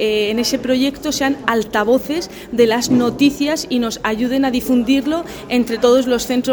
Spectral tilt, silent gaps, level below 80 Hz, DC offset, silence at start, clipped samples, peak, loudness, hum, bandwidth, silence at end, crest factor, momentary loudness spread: -4 dB/octave; none; -44 dBFS; under 0.1%; 0 s; under 0.1%; 0 dBFS; -17 LUFS; none; over 20 kHz; 0 s; 16 dB; 6 LU